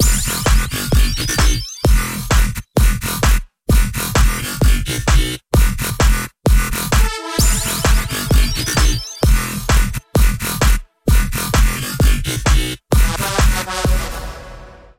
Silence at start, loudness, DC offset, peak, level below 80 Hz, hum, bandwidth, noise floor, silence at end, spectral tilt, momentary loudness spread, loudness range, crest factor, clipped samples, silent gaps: 0 s; -17 LUFS; under 0.1%; -2 dBFS; -16 dBFS; none; 17 kHz; -37 dBFS; 0.3 s; -4 dB/octave; 3 LU; 1 LU; 12 dB; under 0.1%; none